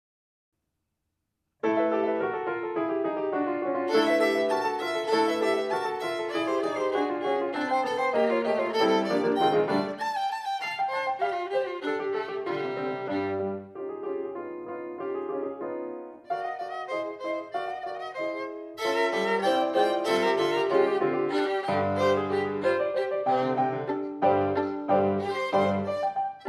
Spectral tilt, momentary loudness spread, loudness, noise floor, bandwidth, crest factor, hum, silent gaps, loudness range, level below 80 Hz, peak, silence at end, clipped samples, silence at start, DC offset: -5.5 dB/octave; 10 LU; -28 LUFS; -81 dBFS; 13.5 kHz; 16 dB; none; none; 8 LU; -74 dBFS; -10 dBFS; 0 s; under 0.1%; 1.65 s; under 0.1%